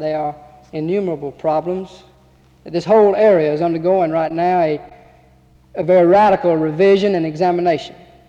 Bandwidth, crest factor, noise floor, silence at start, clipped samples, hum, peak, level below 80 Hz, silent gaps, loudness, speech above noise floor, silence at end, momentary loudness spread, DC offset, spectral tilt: 8.2 kHz; 14 dB; -50 dBFS; 0 s; under 0.1%; none; -4 dBFS; -52 dBFS; none; -16 LUFS; 35 dB; 0.35 s; 14 LU; under 0.1%; -7.5 dB/octave